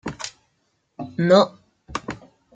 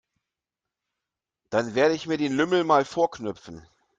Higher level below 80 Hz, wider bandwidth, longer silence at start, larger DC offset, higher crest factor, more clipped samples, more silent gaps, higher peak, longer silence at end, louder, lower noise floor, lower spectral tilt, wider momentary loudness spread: first, -54 dBFS vs -66 dBFS; about the same, 9.2 kHz vs 9.2 kHz; second, 0.05 s vs 1.5 s; neither; about the same, 20 dB vs 20 dB; neither; neither; about the same, -4 dBFS vs -6 dBFS; about the same, 0.4 s vs 0.4 s; first, -21 LUFS vs -24 LUFS; second, -70 dBFS vs -88 dBFS; about the same, -5.5 dB/octave vs -5 dB/octave; first, 21 LU vs 13 LU